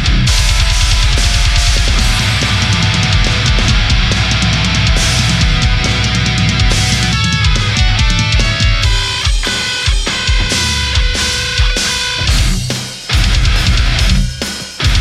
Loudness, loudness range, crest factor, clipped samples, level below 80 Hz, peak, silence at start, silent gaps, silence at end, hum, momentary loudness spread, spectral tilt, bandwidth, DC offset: -12 LUFS; 2 LU; 12 dB; under 0.1%; -14 dBFS; 0 dBFS; 0 s; none; 0 s; none; 3 LU; -3.5 dB/octave; 14 kHz; under 0.1%